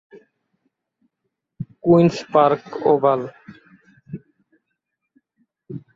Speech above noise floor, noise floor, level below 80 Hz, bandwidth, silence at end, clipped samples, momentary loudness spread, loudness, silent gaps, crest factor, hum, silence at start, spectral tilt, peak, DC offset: 61 dB; -78 dBFS; -60 dBFS; 7.6 kHz; 0.15 s; under 0.1%; 23 LU; -18 LUFS; none; 20 dB; none; 1.6 s; -8 dB/octave; -2 dBFS; under 0.1%